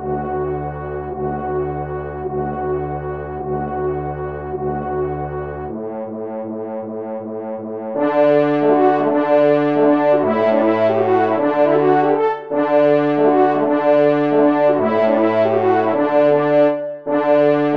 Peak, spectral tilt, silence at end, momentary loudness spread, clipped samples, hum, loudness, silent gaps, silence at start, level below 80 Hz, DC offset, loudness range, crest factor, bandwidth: -4 dBFS; -9 dB/octave; 0 s; 12 LU; under 0.1%; none; -17 LUFS; none; 0 s; -42 dBFS; 0.2%; 9 LU; 14 dB; 5.6 kHz